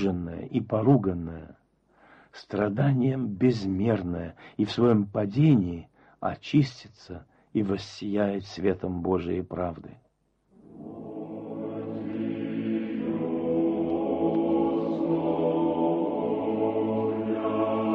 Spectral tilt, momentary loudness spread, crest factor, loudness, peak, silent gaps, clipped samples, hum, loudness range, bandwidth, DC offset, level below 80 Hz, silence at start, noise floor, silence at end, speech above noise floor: -8.5 dB/octave; 15 LU; 18 dB; -27 LUFS; -10 dBFS; none; under 0.1%; none; 8 LU; 7.6 kHz; under 0.1%; -58 dBFS; 0 s; -69 dBFS; 0 s; 43 dB